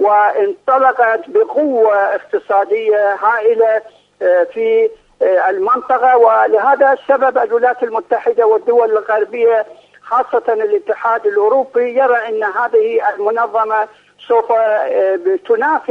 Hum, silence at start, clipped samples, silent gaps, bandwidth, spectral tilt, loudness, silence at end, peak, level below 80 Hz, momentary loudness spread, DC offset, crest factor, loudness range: none; 0 s; under 0.1%; none; 4.8 kHz; -5 dB/octave; -14 LUFS; 0.1 s; 0 dBFS; -68 dBFS; 5 LU; under 0.1%; 14 dB; 3 LU